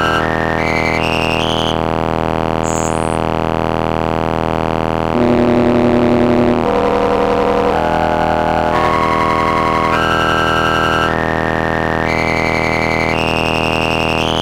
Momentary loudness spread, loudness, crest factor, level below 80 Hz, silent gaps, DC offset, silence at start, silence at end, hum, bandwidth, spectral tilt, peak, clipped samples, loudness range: 4 LU; -14 LUFS; 14 dB; -32 dBFS; none; under 0.1%; 0 s; 0 s; none; 16.5 kHz; -5.5 dB/octave; 0 dBFS; under 0.1%; 3 LU